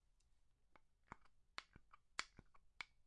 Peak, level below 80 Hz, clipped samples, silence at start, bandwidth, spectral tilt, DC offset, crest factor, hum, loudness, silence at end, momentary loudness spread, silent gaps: -24 dBFS; -76 dBFS; under 0.1%; 0.1 s; 10.5 kHz; -1 dB/octave; under 0.1%; 38 dB; none; -56 LUFS; 0 s; 13 LU; none